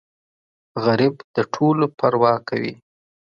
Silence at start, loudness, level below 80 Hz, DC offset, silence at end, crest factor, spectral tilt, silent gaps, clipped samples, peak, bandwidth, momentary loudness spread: 0.75 s; -20 LUFS; -64 dBFS; under 0.1%; 0.6 s; 20 dB; -7.5 dB/octave; 1.24-1.34 s; under 0.1%; -2 dBFS; 7.2 kHz; 8 LU